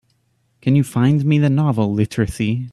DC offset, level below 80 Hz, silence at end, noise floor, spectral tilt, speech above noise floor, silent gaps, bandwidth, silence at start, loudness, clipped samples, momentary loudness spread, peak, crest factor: under 0.1%; -44 dBFS; 0.05 s; -64 dBFS; -7.5 dB/octave; 47 dB; none; 13 kHz; 0.65 s; -18 LUFS; under 0.1%; 5 LU; -4 dBFS; 14 dB